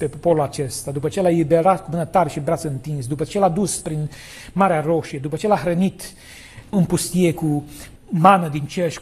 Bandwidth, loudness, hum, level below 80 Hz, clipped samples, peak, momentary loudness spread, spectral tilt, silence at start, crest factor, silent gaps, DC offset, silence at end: 14 kHz; -20 LUFS; none; -46 dBFS; under 0.1%; 0 dBFS; 14 LU; -6 dB/octave; 0 s; 20 dB; none; under 0.1%; 0 s